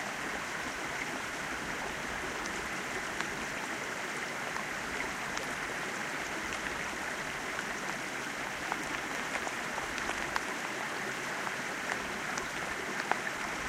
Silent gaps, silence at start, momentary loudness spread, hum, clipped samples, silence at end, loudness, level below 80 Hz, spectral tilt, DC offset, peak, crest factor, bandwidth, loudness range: none; 0 s; 2 LU; none; under 0.1%; 0 s; -35 LUFS; -60 dBFS; -2 dB/octave; under 0.1%; -10 dBFS; 26 dB; 16 kHz; 1 LU